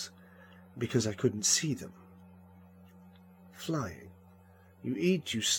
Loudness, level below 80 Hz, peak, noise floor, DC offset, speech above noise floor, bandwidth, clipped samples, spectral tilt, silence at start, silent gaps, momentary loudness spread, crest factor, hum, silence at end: -32 LUFS; -70 dBFS; -14 dBFS; -58 dBFS; under 0.1%; 27 dB; 17.5 kHz; under 0.1%; -3.5 dB/octave; 0 s; none; 17 LU; 20 dB; none; 0 s